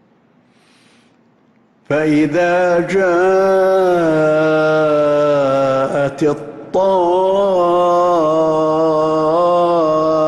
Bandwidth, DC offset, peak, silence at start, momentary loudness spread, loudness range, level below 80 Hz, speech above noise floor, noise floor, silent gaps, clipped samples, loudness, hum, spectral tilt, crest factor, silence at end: 12 kHz; under 0.1%; -6 dBFS; 1.9 s; 4 LU; 2 LU; -52 dBFS; 41 dB; -53 dBFS; none; under 0.1%; -14 LUFS; none; -6.5 dB/octave; 10 dB; 0 s